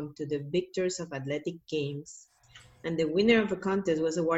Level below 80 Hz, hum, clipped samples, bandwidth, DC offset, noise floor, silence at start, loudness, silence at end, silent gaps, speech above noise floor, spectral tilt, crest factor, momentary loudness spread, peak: -64 dBFS; none; under 0.1%; 8.4 kHz; under 0.1%; -56 dBFS; 0 s; -30 LUFS; 0 s; none; 27 dB; -5.5 dB/octave; 18 dB; 14 LU; -12 dBFS